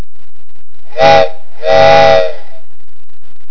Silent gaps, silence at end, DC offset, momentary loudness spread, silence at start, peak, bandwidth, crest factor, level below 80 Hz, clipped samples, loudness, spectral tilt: none; 1.15 s; 40%; 15 LU; 0.95 s; 0 dBFS; 5.4 kHz; 14 dB; -42 dBFS; 4%; -8 LUFS; -4.5 dB/octave